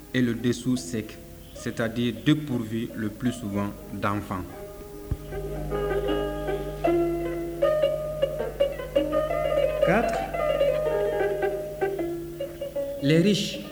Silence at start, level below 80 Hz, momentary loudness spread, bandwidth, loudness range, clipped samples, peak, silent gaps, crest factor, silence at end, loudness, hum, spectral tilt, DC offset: 0 s; -42 dBFS; 11 LU; over 20 kHz; 5 LU; under 0.1%; -8 dBFS; none; 20 dB; 0 s; -27 LUFS; none; -6 dB/octave; under 0.1%